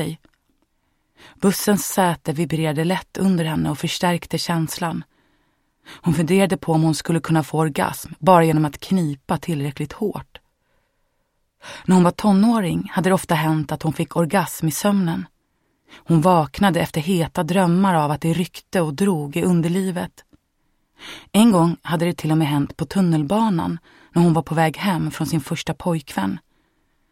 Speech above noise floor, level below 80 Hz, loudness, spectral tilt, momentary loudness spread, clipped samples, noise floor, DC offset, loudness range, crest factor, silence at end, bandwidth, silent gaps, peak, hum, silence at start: 50 dB; -50 dBFS; -20 LUFS; -6 dB/octave; 10 LU; under 0.1%; -69 dBFS; under 0.1%; 4 LU; 20 dB; 0.75 s; 16.5 kHz; none; -2 dBFS; none; 0 s